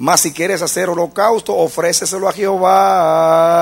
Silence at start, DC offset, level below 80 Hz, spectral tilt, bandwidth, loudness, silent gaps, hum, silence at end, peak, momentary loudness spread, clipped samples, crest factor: 0 s; under 0.1%; -54 dBFS; -3 dB/octave; 16.5 kHz; -14 LUFS; none; none; 0 s; 0 dBFS; 6 LU; under 0.1%; 14 dB